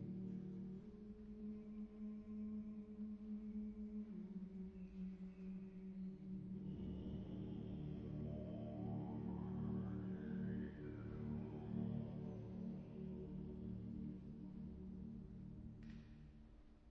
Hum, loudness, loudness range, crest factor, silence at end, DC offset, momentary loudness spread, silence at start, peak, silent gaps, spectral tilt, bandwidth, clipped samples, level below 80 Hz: none; -51 LUFS; 4 LU; 16 dB; 0 s; under 0.1%; 9 LU; 0 s; -34 dBFS; none; -10 dB/octave; 5.6 kHz; under 0.1%; -62 dBFS